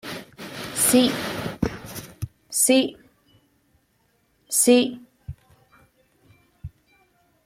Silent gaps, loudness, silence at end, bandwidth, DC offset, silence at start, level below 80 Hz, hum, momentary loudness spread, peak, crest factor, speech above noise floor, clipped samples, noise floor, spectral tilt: none; -21 LUFS; 0.75 s; 16.5 kHz; under 0.1%; 0.05 s; -52 dBFS; none; 25 LU; -4 dBFS; 20 dB; 48 dB; under 0.1%; -66 dBFS; -3 dB/octave